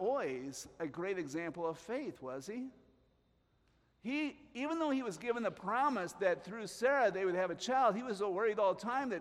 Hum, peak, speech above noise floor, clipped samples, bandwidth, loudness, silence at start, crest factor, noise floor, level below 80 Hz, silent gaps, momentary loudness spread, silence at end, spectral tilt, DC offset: none; -20 dBFS; 38 dB; under 0.1%; 15 kHz; -37 LUFS; 0 s; 18 dB; -74 dBFS; -76 dBFS; none; 12 LU; 0 s; -4.5 dB/octave; under 0.1%